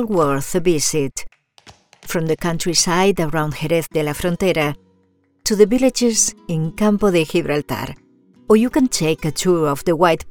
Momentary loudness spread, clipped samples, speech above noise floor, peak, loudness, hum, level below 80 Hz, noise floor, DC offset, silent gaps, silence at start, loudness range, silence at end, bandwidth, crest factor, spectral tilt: 9 LU; under 0.1%; 42 dB; 0 dBFS; -18 LUFS; none; -42 dBFS; -60 dBFS; under 0.1%; none; 0 s; 2 LU; 0 s; over 20 kHz; 18 dB; -4.5 dB/octave